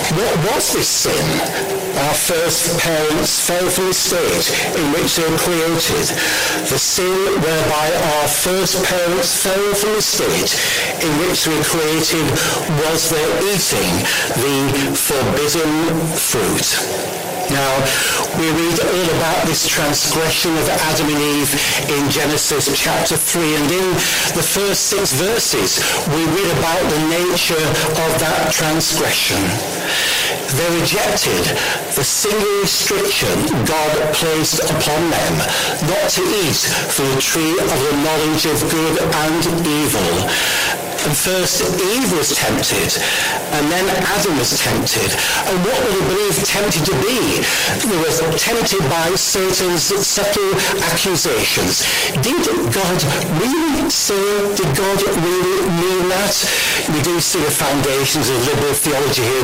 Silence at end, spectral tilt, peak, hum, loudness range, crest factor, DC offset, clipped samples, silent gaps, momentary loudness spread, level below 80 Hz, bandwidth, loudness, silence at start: 0 s; -3 dB/octave; -4 dBFS; none; 1 LU; 12 dB; under 0.1%; under 0.1%; none; 2 LU; -40 dBFS; 16.5 kHz; -15 LUFS; 0 s